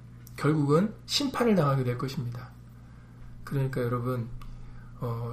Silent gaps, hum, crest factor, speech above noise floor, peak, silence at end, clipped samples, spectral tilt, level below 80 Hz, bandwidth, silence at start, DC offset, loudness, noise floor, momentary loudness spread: none; 60 Hz at -45 dBFS; 18 dB; 21 dB; -12 dBFS; 0 s; under 0.1%; -6 dB/octave; -50 dBFS; 15.5 kHz; 0 s; under 0.1%; -28 LUFS; -48 dBFS; 23 LU